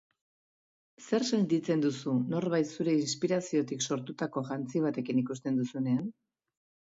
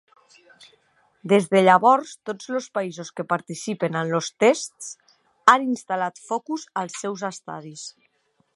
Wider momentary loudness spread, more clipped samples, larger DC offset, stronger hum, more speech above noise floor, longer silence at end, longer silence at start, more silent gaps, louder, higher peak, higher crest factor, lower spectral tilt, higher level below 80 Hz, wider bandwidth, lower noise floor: second, 6 LU vs 19 LU; neither; neither; neither; first, over 60 dB vs 45 dB; about the same, 0.75 s vs 0.65 s; second, 1 s vs 1.25 s; neither; second, -31 LUFS vs -22 LUFS; second, -16 dBFS vs 0 dBFS; second, 16 dB vs 24 dB; about the same, -5.5 dB/octave vs -4.5 dB/octave; about the same, -76 dBFS vs -76 dBFS; second, 7.8 kHz vs 11.5 kHz; first, under -90 dBFS vs -67 dBFS